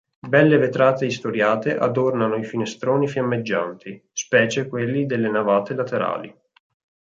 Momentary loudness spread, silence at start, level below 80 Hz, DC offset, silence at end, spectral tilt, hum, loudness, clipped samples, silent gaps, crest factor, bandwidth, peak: 10 LU; 0.25 s; -66 dBFS; under 0.1%; 0.7 s; -5.5 dB/octave; none; -21 LUFS; under 0.1%; none; 18 dB; 7.8 kHz; -2 dBFS